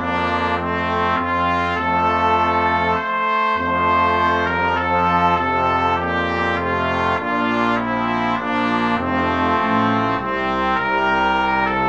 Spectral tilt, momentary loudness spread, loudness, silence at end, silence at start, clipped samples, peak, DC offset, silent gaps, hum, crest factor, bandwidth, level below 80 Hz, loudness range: -6.5 dB/octave; 3 LU; -18 LUFS; 0 s; 0 s; under 0.1%; -4 dBFS; 0.3%; none; none; 14 dB; 8.4 kHz; -42 dBFS; 2 LU